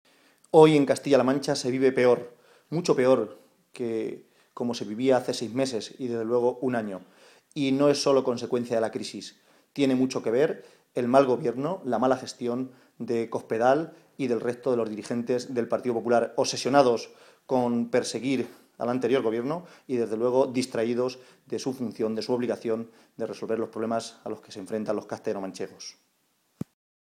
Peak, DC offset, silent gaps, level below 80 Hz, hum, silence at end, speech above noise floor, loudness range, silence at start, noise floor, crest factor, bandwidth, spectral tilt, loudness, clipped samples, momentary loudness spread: -4 dBFS; under 0.1%; none; -72 dBFS; none; 1.2 s; 45 dB; 5 LU; 0.55 s; -71 dBFS; 22 dB; 14 kHz; -5.5 dB/octave; -26 LUFS; under 0.1%; 15 LU